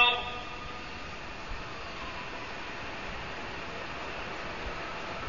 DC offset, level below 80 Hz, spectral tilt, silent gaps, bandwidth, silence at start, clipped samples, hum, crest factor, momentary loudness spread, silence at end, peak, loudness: 0.5%; -50 dBFS; -0.5 dB/octave; none; 7.2 kHz; 0 s; under 0.1%; none; 24 dB; 3 LU; 0 s; -12 dBFS; -36 LUFS